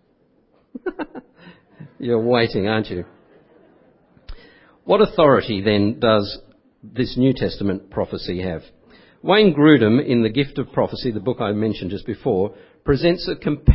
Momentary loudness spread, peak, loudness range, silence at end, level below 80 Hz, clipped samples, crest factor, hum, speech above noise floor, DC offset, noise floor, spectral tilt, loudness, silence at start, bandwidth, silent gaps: 17 LU; 0 dBFS; 6 LU; 0 s; -34 dBFS; under 0.1%; 20 dB; none; 42 dB; under 0.1%; -60 dBFS; -11 dB/octave; -19 LUFS; 0.75 s; 5.8 kHz; none